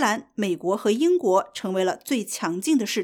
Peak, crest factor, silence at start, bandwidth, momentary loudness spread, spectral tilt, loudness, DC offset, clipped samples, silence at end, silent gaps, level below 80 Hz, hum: -8 dBFS; 16 dB; 0 s; 18 kHz; 7 LU; -4 dB/octave; -24 LUFS; under 0.1%; under 0.1%; 0 s; none; -74 dBFS; none